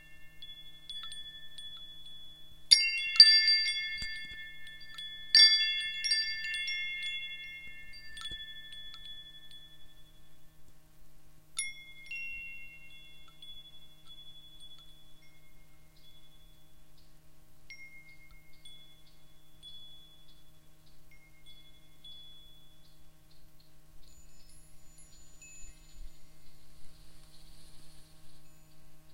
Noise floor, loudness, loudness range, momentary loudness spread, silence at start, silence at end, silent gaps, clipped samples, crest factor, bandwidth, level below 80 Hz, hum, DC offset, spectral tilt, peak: -59 dBFS; -25 LUFS; 23 LU; 31 LU; 0 s; 0.05 s; none; under 0.1%; 32 dB; 16 kHz; -60 dBFS; none; 0.4%; 2 dB/octave; -4 dBFS